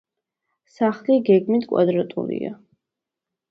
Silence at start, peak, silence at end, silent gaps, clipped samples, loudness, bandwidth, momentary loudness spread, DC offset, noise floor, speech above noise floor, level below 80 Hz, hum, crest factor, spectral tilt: 0.8 s; -4 dBFS; 0.95 s; none; under 0.1%; -21 LUFS; 6.4 kHz; 11 LU; under 0.1%; -85 dBFS; 66 dB; -70 dBFS; none; 18 dB; -9 dB/octave